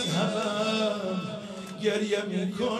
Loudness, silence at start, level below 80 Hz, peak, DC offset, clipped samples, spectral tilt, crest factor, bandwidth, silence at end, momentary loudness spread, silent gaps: -29 LUFS; 0 s; -68 dBFS; -12 dBFS; under 0.1%; under 0.1%; -5 dB/octave; 16 dB; 14 kHz; 0 s; 9 LU; none